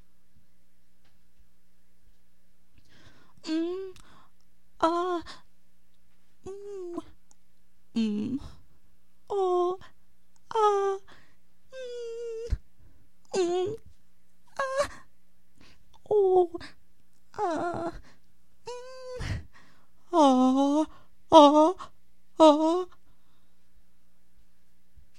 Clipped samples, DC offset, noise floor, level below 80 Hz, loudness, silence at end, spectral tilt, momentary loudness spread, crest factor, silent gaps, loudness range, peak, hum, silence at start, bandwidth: under 0.1%; 0.6%; -70 dBFS; -50 dBFS; -26 LUFS; 2.35 s; -5.5 dB/octave; 23 LU; 26 dB; none; 14 LU; -4 dBFS; none; 3.45 s; 11.5 kHz